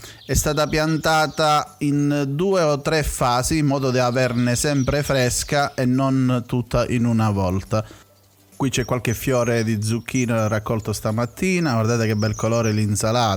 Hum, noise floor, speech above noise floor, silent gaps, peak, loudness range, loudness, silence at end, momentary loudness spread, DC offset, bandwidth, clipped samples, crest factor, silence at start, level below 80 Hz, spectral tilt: none; -53 dBFS; 33 dB; none; -6 dBFS; 3 LU; -20 LUFS; 0 s; 4 LU; under 0.1%; 20 kHz; under 0.1%; 14 dB; 0 s; -38 dBFS; -5 dB/octave